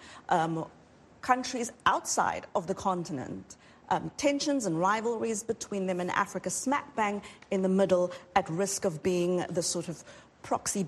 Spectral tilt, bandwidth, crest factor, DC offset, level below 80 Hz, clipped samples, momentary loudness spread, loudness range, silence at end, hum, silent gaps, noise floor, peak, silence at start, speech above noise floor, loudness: -4 dB/octave; 12.5 kHz; 22 dB; under 0.1%; -64 dBFS; under 0.1%; 10 LU; 2 LU; 0 s; none; none; -49 dBFS; -8 dBFS; 0 s; 19 dB; -30 LUFS